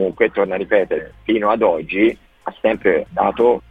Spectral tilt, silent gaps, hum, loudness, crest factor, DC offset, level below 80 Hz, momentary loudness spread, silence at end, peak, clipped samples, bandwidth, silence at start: -7.5 dB/octave; none; none; -18 LUFS; 16 dB; under 0.1%; -48 dBFS; 7 LU; 0.1 s; -2 dBFS; under 0.1%; 4.6 kHz; 0 s